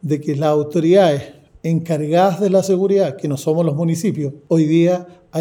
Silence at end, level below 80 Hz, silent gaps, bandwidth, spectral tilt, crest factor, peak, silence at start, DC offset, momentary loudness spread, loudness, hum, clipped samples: 0 s; -60 dBFS; none; 16.5 kHz; -7 dB/octave; 14 dB; -2 dBFS; 0.05 s; under 0.1%; 9 LU; -17 LUFS; none; under 0.1%